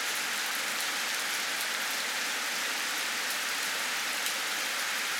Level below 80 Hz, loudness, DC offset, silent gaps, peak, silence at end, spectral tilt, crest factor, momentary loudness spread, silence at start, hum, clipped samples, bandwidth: under -90 dBFS; -30 LUFS; under 0.1%; none; -14 dBFS; 0 s; 1.5 dB/octave; 18 dB; 0 LU; 0 s; none; under 0.1%; 18 kHz